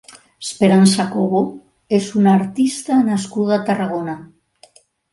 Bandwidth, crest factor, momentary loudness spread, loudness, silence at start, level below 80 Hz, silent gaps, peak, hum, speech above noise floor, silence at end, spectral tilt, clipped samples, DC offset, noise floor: 11.5 kHz; 18 dB; 13 LU; -17 LUFS; 0.15 s; -60 dBFS; none; 0 dBFS; none; 35 dB; 0.9 s; -6 dB/octave; under 0.1%; under 0.1%; -51 dBFS